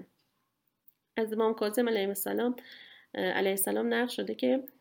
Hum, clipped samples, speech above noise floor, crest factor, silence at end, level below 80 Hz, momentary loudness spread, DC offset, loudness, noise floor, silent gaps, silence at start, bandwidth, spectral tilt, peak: none; under 0.1%; 48 dB; 18 dB; 0.1 s; -82 dBFS; 12 LU; under 0.1%; -30 LUFS; -79 dBFS; none; 0 s; 17 kHz; -3.5 dB/octave; -14 dBFS